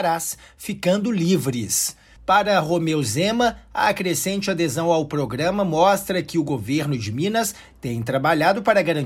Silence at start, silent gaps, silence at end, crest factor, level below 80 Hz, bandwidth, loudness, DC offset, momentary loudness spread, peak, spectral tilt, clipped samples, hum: 0 s; none; 0 s; 16 dB; -52 dBFS; 16.5 kHz; -21 LUFS; under 0.1%; 7 LU; -4 dBFS; -4.5 dB/octave; under 0.1%; none